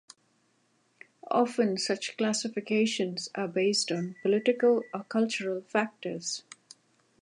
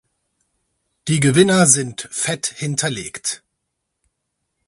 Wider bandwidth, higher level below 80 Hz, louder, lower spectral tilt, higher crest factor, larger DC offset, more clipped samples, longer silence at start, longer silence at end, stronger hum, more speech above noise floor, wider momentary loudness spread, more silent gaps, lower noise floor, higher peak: about the same, 11.5 kHz vs 12 kHz; second, -82 dBFS vs -56 dBFS; second, -29 LUFS vs -17 LUFS; about the same, -4 dB/octave vs -4 dB/octave; about the same, 18 dB vs 20 dB; neither; neither; first, 1.25 s vs 1.05 s; second, 0.8 s vs 1.3 s; neither; second, 42 dB vs 59 dB; second, 9 LU vs 13 LU; neither; second, -70 dBFS vs -76 dBFS; second, -12 dBFS vs 0 dBFS